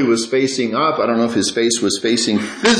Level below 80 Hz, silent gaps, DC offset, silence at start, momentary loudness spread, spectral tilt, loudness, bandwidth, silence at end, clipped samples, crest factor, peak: -58 dBFS; none; under 0.1%; 0 s; 1 LU; -3 dB/octave; -17 LUFS; 11 kHz; 0 s; under 0.1%; 14 dB; -2 dBFS